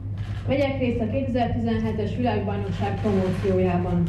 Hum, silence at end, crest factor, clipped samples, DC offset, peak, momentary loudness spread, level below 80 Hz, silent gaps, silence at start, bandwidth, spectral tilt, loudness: none; 0 s; 12 dB; under 0.1%; under 0.1%; -12 dBFS; 4 LU; -38 dBFS; none; 0 s; 8.6 kHz; -8.5 dB/octave; -24 LUFS